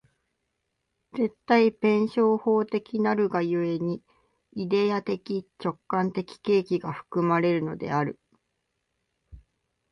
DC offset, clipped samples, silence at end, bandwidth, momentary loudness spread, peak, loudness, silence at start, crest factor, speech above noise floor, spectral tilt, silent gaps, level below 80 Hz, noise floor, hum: under 0.1%; under 0.1%; 0.55 s; 7 kHz; 11 LU; -8 dBFS; -26 LUFS; 1.15 s; 18 dB; 54 dB; -8 dB/octave; none; -64 dBFS; -79 dBFS; none